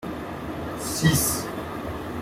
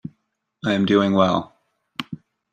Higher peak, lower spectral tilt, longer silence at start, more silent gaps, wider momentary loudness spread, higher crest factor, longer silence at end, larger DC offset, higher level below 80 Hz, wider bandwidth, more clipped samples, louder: second, -8 dBFS vs -4 dBFS; second, -4 dB/octave vs -7 dB/octave; second, 0 s vs 0.65 s; neither; second, 13 LU vs 22 LU; about the same, 20 dB vs 18 dB; second, 0 s vs 0.4 s; neither; first, -46 dBFS vs -60 dBFS; first, 16.5 kHz vs 8.8 kHz; neither; second, -26 LUFS vs -20 LUFS